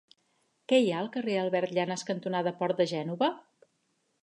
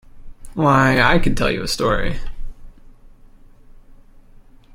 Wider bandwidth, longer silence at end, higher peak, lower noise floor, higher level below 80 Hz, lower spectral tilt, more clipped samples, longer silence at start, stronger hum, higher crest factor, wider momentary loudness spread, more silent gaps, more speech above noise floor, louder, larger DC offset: second, 10.5 kHz vs 15.5 kHz; second, 0.85 s vs 2.05 s; second, -10 dBFS vs -2 dBFS; first, -75 dBFS vs -45 dBFS; second, -84 dBFS vs -30 dBFS; about the same, -5.5 dB/octave vs -5.5 dB/octave; neither; first, 0.7 s vs 0.15 s; neither; about the same, 20 dB vs 18 dB; second, 7 LU vs 19 LU; neither; first, 47 dB vs 29 dB; second, -29 LUFS vs -17 LUFS; neither